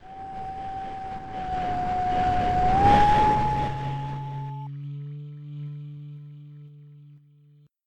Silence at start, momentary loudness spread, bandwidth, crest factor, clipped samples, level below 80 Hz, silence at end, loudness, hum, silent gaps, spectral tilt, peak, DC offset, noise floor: 0 s; 22 LU; 9.6 kHz; 18 dB; under 0.1%; -40 dBFS; 0.7 s; -25 LUFS; none; none; -7 dB/octave; -8 dBFS; under 0.1%; -57 dBFS